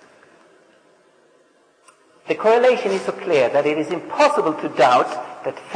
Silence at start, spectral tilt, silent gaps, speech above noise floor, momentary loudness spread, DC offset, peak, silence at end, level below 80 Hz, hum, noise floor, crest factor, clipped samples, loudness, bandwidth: 2.25 s; -4.5 dB/octave; none; 39 dB; 11 LU; under 0.1%; -4 dBFS; 0 s; -74 dBFS; none; -57 dBFS; 16 dB; under 0.1%; -18 LUFS; 10.5 kHz